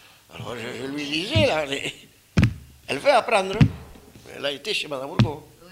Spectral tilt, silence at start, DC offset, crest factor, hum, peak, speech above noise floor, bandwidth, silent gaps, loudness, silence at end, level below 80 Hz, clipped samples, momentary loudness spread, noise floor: -5.5 dB/octave; 0.3 s; under 0.1%; 20 dB; none; -4 dBFS; 21 dB; 16 kHz; none; -23 LUFS; 0 s; -42 dBFS; under 0.1%; 19 LU; -45 dBFS